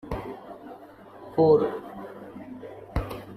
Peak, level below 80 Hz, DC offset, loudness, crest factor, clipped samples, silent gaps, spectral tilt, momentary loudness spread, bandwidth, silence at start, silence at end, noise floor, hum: -8 dBFS; -44 dBFS; under 0.1%; -25 LUFS; 20 dB; under 0.1%; none; -8.5 dB/octave; 25 LU; 13.5 kHz; 0.05 s; 0 s; -47 dBFS; none